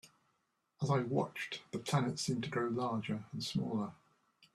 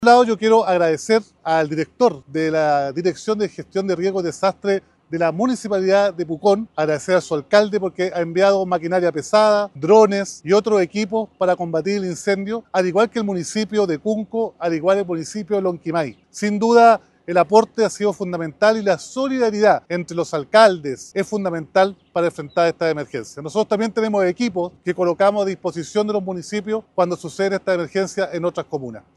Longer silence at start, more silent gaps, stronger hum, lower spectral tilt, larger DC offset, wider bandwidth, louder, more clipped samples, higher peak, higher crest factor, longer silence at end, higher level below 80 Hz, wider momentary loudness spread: about the same, 0.05 s vs 0 s; neither; neither; about the same, -5.5 dB/octave vs -5 dB/octave; neither; first, 14 kHz vs 12 kHz; second, -37 LUFS vs -19 LUFS; neither; second, -18 dBFS vs 0 dBFS; about the same, 20 dB vs 18 dB; first, 0.6 s vs 0.2 s; second, -72 dBFS vs -62 dBFS; about the same, 8 LU vs 9 LU